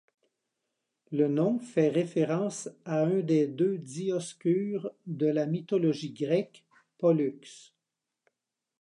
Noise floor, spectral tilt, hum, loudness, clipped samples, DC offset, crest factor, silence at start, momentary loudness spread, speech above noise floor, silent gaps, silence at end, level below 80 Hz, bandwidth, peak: -87 dBFS; -7 dB/octave; none; -29 LUFS; under 0.1%; under 0.1%; 16 dB; 1.1 s; 9 LU; 59 dB; none; 1.2 s; -82 dBFS; 11 kHz; -14 dBFS